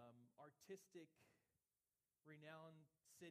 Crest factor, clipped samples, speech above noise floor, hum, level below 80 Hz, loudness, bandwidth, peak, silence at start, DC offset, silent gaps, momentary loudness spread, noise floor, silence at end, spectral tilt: 20 dB; under 0.1%; over 27 dB; none; under -90 dBFS; -64 LUFS; 15 kHz; -46 dBFS; 0 s; under 0.1%; none; 7 LU; under -90 dBFS; 0 s; -5 dB/octave